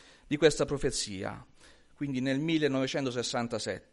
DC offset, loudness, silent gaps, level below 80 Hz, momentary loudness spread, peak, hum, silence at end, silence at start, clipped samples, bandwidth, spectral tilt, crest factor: under 0.1%; -31 LUFS; none; -52 dBFS; 12 LU; -8 dBFS; none; 0.1 s; 0.3 s; under 0.1%; 11.5 kHz; -4.5 dB/octave; 24 dB